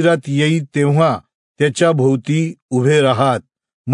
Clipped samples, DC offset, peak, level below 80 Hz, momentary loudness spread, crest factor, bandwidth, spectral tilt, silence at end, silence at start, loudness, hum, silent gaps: under 0.1%; under 0.1%; -2 dBFS; -62 dBFS; 6 LU; 14 dB; 11 kHz; -6.5 dB/octave; 0 s; 0 s; -16 LUFS; none; 1.34-1.55 s, 2.62-2.69 s, 3.74-3.84 s